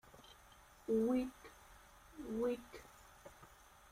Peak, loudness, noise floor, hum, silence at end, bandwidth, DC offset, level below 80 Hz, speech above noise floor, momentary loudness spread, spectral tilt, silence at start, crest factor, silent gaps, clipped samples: -26 dBFS; -40 LUFS; -63 dBFS; none; 0.45 s; 16 kHz; under 0.1%; -66 dBFS; 25 dB; 25 LU; -6 dB/octave; 0.15 s; 18 dB; none; under 0.1%